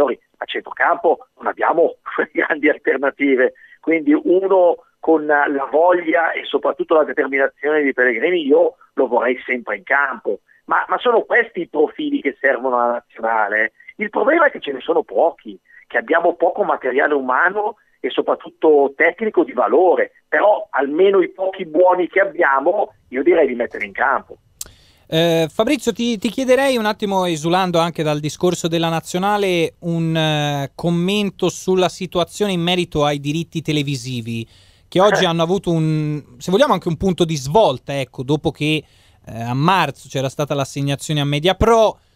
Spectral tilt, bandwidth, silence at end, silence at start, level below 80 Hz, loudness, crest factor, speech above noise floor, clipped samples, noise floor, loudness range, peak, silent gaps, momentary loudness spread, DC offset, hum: -5.5 dB/octave; 16 kHz; 0.2 s; 0 s; -48 dBFS; -18 LUFS; 16 dB; 21 dB; under 0.1%; -38 dBFS; 3 LU; -2 dBFS; none; 9 LU; under 0.1%; none